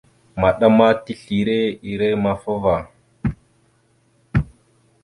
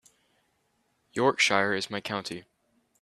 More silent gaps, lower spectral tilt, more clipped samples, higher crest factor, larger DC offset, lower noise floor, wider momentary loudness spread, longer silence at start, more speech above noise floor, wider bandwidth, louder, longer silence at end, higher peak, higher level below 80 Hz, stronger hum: neither; first, -8 dB/octave vs -3 dB/octave; neither; about the same, 20 dB vs 24 dB; neither; second, -60 dBFS vs -73 dBFS; second, 13 LU vs 16 LU; second, 0.35 s vs 1.15 s; second, 42 dB vs 46 dB; second, 11 kHz vs 14 kHz; first, -19 LUFS vs -26 LUFS; about the same, 0.6 s vs 0.6 s; first, -2 dBFS vs -8 dBFS; first, -40 dBFS vs -72 dBFS; neither